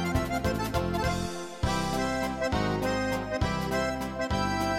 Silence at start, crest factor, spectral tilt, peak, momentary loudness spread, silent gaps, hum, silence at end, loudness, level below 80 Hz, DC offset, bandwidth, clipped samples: 0 s; 14 dB; -5.5 dB/octave; -14 dBFS; 3 LU; none; none; 0 s; -29 LUFS; -40 dBFS; under 0.1%; 16.5 kHz; under 0.1%